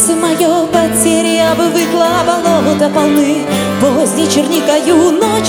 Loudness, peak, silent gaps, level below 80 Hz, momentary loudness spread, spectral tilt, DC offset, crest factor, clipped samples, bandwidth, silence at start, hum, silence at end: -11 LUFS; 0 dBFS; none; -44 dBFS; 2 LU; -4 dB/octave; under 0.1%; 10 dB; under 0.1%; over 20 kHz; 0 s; none; 0 s